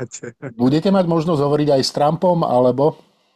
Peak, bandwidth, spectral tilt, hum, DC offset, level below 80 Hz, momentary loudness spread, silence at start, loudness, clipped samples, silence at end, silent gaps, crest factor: -4 dBFS; 13 kHz; -6.5 dB/octave; none; under 0.1%; -54 dBFS; 7 LU; 0 s; -17 LUFS; under 0.1%; 0.4 s; none; 12 dB